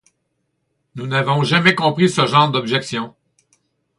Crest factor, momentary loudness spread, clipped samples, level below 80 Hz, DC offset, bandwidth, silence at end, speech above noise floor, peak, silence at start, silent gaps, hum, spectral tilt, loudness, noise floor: 18 dB; 13 LU; under 0.1%; -60 dBFS; under 0.1%; 11.5 kHz; 0.9 s; 55 dB; 0 dBFS; 0.95 s; none; none; -5 dB/octave; -16 LUFS; -71 dBFS